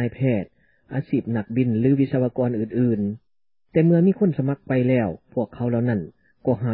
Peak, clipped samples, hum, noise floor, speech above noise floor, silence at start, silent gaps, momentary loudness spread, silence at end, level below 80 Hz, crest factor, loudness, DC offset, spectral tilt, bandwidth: -8 dBFS; under 0.1%; none; -66 dBFS; 45 dB; 0 s; none; 11 LU; 0 s; -54 dBFS; 14 dB; -22 LUFS; under 0.1%; -13.5 dB/octave; 4.3 kHz